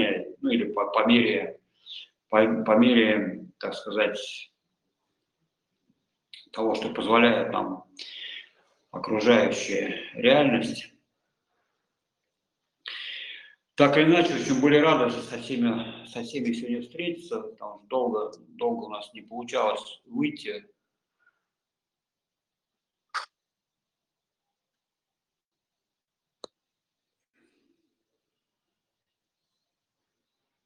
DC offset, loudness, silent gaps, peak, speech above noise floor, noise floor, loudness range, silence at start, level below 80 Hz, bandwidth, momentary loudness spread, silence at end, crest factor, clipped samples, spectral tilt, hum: under 0.1%; -25 LUFS; none; -4 dBFS; 64 dB; -89 dBFS; 22 LU; 0 s; -70 dBFS; 11 kHz; 20 LU; 7.4 s; 24 dB; under 0.1%; -5 dB/octave; none